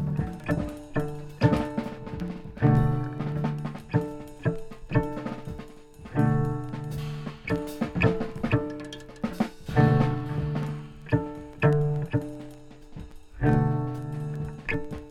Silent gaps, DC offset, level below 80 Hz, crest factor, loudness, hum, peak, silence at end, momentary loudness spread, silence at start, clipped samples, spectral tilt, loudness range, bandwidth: none; under 0.1%; -42 dBFS; 22 dB; -28 LUFS; none; -6 dBFS; 0 s; 15 LU; 0 s; under 0.1%; -8.5 dB/octave; 4 LU; 13 kHz